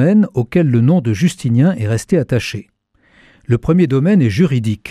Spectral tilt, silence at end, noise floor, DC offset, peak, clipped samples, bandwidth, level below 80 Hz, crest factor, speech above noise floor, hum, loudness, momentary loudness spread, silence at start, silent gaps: -7.5 dB/octave; 0 s; -53 dBFS; under 0.1%; -2 dBFS; under 0.1%; 13.5 kHz; -42 dBFS; 12 dB; 39 dB; none; -15 LUFS; 7 LU; 0 s; none